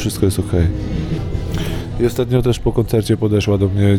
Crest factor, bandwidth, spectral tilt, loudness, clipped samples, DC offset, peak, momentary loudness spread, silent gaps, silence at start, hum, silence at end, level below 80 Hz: 14 dB; 17 kHz; -7 dB/octave; -18 LUFS; under 0.1%; under 0.1%; -2 dBFS; 7 LU; none; 0 s; none; 0 s; -28 dBFS